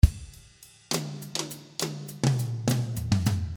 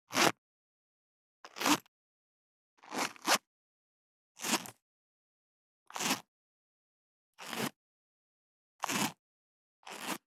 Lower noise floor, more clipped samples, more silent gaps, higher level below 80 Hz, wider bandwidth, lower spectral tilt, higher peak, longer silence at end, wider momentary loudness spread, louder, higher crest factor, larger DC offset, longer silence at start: second, -53 dBFS vs under -90 dBFS; neither; second, none vs 0.38-1.44 s, 1.88-2.77 s, 3.47-4.35 s, 4.82-5.86 s, 6.28-7.33 s, 7.76-8.79 s, 9.19-9.83 s; first, -34 dBFS vs under -90 dBFS; first, over 20 kHz vs 17.5 kHz; first, -5 dB/octave vs -1.5 dB/octave; first, -4 dBFS vs -8 dBFS; second, 0 s vs 0.2 s; second, 10 LU vs 18 LU; first, -29 LUFS vs -34 LUFS; second, 24 dB vs 30 dB; neither; about the same, 0.05 s vs 0.1 s